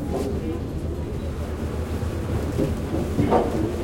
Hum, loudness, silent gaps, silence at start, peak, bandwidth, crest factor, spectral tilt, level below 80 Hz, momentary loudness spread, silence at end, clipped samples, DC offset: none; -26 LUFS; none; 0 s; -4 dBFS; 16.5 kHz; 20 dB; -7.5 dB/octave; -34 dBFS; 8 LU; 0 s; under 0.1%; under 0.1%